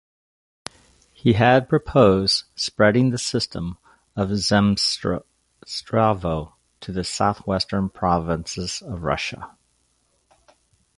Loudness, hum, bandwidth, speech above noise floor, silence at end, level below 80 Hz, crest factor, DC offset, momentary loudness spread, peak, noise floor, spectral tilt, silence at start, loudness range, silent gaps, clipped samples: -21 LUFS; none; 11.5 kHz; 46 dB; 1.5 s; -44 dBFS; 20 dB; under 0.1%; 18 LU; -2 dBFS; -66 dBFS; -5 dB/octave; 1.25 s; 6 LU; none; under 0.1%